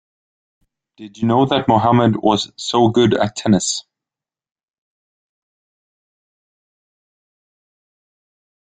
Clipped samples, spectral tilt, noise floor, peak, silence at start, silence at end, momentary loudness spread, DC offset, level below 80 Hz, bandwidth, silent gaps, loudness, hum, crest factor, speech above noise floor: under 0.1%; -5 dB/octave; -89 dBFS; -2 dBFS; 1 s; 4.85 s; 6 LU; under 0.1%; -54 dBFS; 9.4 kHz; none; -16 LUFS; none; 18 dB; 73 dB